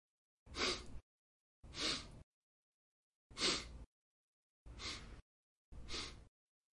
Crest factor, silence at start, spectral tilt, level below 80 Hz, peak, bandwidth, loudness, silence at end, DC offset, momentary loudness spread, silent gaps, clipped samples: 26 dB; 0.45 s; -2 dB/octave; -60 dBFS; -22 dBFS; 11.5 kHz; -42 LUFS; 0.45 s; under 0.1%; 25 LU; 1.03-1.63 s, 2.23-3.30 s, 3.86-4.66 s, 5.22-5.72 s; under 0.1%